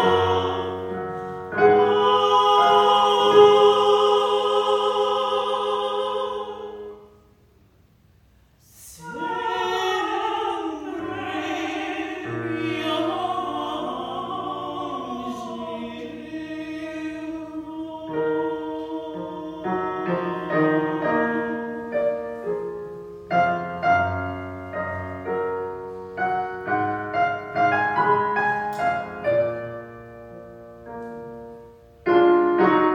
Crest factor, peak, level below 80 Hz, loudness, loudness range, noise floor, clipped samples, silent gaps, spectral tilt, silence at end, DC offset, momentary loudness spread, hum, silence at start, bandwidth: 22 dB; -2 dBFS; -58 dBFS; -23 LUFS; 13 LU; -57 dBFS; under 0.1%; none; -5.5 dB/octave; 0 s; under 0.1%; 17 LU; none; 0 s; 14 kHz